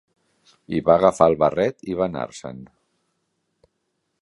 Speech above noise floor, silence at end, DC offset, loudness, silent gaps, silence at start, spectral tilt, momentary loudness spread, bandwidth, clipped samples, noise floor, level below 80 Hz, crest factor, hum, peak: 55 dB; 1.55 s; under 0.1%; -20 LUFS; none; 0.7 s; -6.5 dB/octave; 19 LU; 11.5 kHz; under 0.1%; -75 dBFS; -52 dBFS; 22 dB; none; -2 dBFS